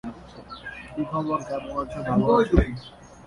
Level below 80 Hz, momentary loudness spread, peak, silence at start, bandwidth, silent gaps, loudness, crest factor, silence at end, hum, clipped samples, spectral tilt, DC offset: -34 dBFS; 20 LU; -2 dBFS; 0.05 s; 11.5 kHz; none; -24 LUFS; 22 dB; 0.05 s; none; under 0.1%; -8 dB/octave; under 0.1%